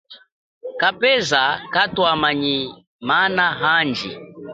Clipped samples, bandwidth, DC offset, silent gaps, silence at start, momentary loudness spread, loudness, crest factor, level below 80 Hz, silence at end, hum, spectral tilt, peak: under 0.1%; 9.2 kHz; under 0.1%; 0.32-0.61 s, 2.87-2.99 s; 0.1 s; 15 LU; -18 LUFS; 18 dB; -56 dBFS; 0 s; none; -3.5 dB/octave; -2 dBFS